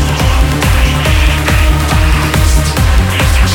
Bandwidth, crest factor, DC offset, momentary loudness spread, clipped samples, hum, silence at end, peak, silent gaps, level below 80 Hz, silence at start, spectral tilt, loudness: 18 kHz; 8 dB; under 0.1%; 1 LU; under 0.1%; none; 0 s; 0 dBFS; none; -12 dBFS; 0 s; -4.5 dB/octave; -11 LUFS